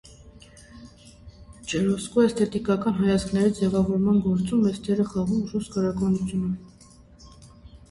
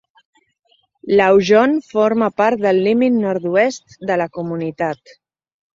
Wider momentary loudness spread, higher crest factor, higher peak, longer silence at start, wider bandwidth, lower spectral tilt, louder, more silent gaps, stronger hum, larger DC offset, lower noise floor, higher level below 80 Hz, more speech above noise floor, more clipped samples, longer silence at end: second, 7 LU vs 11 LU; about the same, 16 dB vs 16 dB; second, -8 dBFS vs -2 dBFS; second, 0.05 s vs 1.05 s; first, 11.5 kHz vs 7.6 kHz; about the same, -7 dB/octave vs -6 dB/octave; second, -24 LUFS vs -16 LUFS; neither; neither; neither; second, -51 dBFS vs -61 dBFS; first, -48 dBFS vs -58 dBFS; second, 28 dB vs 46 dB; neither; second, 0.15 s vs 0.8 s